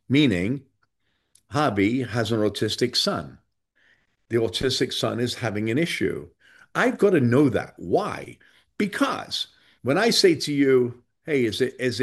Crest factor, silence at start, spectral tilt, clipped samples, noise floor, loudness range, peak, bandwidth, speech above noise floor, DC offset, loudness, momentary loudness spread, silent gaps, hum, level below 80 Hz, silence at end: 18 dB; 0.1 s; -5 dB/octave; under 0.1%; -74 dBFS; 3 LU; -4 dBFS; 12.5 kHz; 51 dB; under 0.1%; -23 LUFS; 11 LU; none; none; -58 dBFS; 0 s